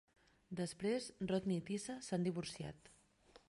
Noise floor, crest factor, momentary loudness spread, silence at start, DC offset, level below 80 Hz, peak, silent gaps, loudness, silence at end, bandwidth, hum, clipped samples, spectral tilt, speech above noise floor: -68 dBFS; 18 dB; 11 LU; 0.5 s; under 0.1%; -72 dBFS; -26 dBFS; none; -42 LUFS; 0.1 s; 11.5 kHz; none; under 0.1%; -5.5 dB/octave; 27 dB